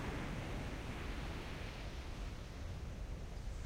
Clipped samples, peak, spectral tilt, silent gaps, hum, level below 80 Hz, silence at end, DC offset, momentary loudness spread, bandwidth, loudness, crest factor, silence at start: under 0.1%; -30 dBFS; -5.5 dB/octave; none; none; -46 dBFS; 0 s; under 0.1%; 4 LU; 16 kHz; -47 LUFS; 14 dB; 0 s